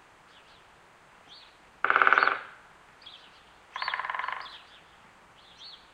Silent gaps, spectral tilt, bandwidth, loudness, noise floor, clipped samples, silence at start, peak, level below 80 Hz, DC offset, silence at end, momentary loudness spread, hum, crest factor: none; -2.5 dB/octave; 10.5 kHz; -27 LUFS; -57 dBFS; under 0.1%; 1.3 s; -2 dBFS; -72 dBFS; under 0.1%; 0.2 s; 29 LU; none; 30 dB